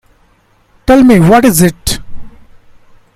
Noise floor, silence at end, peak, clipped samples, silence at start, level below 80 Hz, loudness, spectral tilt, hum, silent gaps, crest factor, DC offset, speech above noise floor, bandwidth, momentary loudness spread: -50 dBFS; 0.9 s; 0 dBFS; 0.7%; 0.9 s; -28 dBFS; -8 LUFS; -5.5 dB/octave; none; none; 10 dB; under 0.1%; 44 dB; 16 kHz; 14 LU